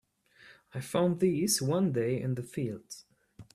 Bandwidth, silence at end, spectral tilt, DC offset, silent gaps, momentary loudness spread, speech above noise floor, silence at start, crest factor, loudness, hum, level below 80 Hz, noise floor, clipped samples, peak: 15 kHz; 0.1 s; -5 dB/octave; under 0.1%; none; 16 LU; 29 dB; 0.45 s; 16 dB; -30 LUFS; none; -68 dBFS; -59 dBFS; under 0.1%; -16 dBFS